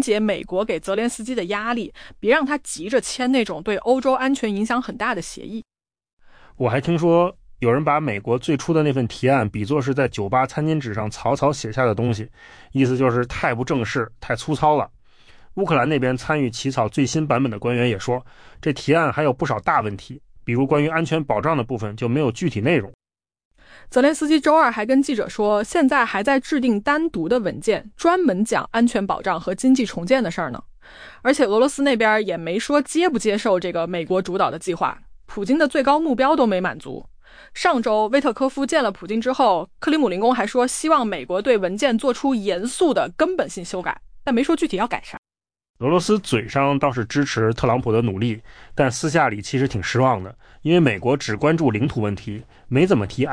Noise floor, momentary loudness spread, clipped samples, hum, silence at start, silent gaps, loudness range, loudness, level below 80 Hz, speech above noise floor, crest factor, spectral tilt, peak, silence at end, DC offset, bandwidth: -47 dBFS; 9 LU; under 0.1%; none; 0 s; 6.13-6.17 s, 22.94-22.99 s, 23.45-23.51 s, 45.18-45.23 s, 45.69-45.74 s; 3 LU; -20 LUFS; -48 dBFS; 27 dB; 16 dB; -5.5 dB/octave; -6 dBFS; 0 s; under 0.1%; 10.5 kHz